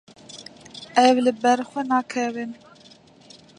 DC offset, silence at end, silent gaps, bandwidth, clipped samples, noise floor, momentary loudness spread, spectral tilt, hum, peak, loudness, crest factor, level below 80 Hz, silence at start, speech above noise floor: under 0.1%; 1.05 s; none; 10.5 kHz; under 0.1%; -51 dBFS; 23 LU; -3.5 dB/octave; none; -2 dBFS; -21 LUFS; 22 dB; -70 dBFS; 0.35 s; 30 dB